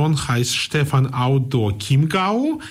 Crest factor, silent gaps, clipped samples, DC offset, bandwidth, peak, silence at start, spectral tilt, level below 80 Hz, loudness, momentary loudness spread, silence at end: 10 dB; none; under 0.1%; under 0.1%; 15.5 kHz; -8 dBFS; 0 s; -5.5 dB/octave; -46 dBFS; -19 LUFS; 3 LU; 0 s